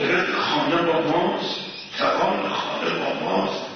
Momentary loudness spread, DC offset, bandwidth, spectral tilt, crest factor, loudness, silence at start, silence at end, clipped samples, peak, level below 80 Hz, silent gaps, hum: 5 LU; under 0.1%; 6.6 kHz; -5 dB/octave; 14 dB; -22 LUFS; 0 s; 0 s; under 0.1%; -8 dBFS; -62 dBFS; none; none